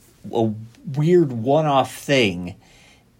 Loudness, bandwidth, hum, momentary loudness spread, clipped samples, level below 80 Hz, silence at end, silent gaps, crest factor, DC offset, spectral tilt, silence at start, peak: -20 LUFS; 16.5 kHz; none; 14 LU; under 0.1%; -58 dBFS; 0.65 s; none; 16 dB; under 0.1%; -6 dB/octave; 0.25 s; -6 dBFS